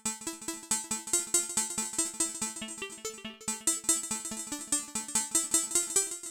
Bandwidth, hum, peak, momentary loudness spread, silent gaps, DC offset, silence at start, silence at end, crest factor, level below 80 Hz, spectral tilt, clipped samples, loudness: 17 kHz; none; -10 dBFS; 12 LU; none; under 0.1%; 0.05 s; 0 s; 24 dB; -66 dBFS; 0 dB/octave; under 0.1%; -30 LUFS